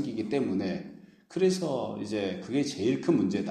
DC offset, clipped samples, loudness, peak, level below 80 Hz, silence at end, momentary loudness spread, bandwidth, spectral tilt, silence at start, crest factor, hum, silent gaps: under 0.1%; under 0.1%; -30 LUFS; -12 dBFS; -68 dBFS; 0 s; 8 LU; 13 kHz; -6 dB/octave; 0 s; 18 dB; none; none